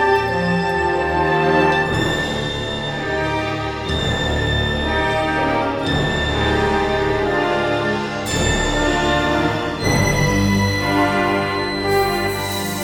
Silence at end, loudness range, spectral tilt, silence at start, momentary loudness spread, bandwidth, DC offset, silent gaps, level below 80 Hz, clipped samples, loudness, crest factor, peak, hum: 0 s; 2 LU; -5 dB/octave; 0 s; 5 LU; over 20 kHz; under 0.1%; none; -32 dBFS; under 0.1%; -18 LUFS; 14 dB; -4 dBFS; none